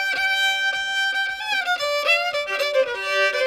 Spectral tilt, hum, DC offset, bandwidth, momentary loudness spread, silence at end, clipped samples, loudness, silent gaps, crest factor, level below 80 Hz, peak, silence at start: 1 dB/octave; none; under 0.1%; 19 kHz; 4 LU; 0 s; under 0.1%; -21 LUFS; none; 14 dB; -64 dBFS; -8 dBFS; 0 s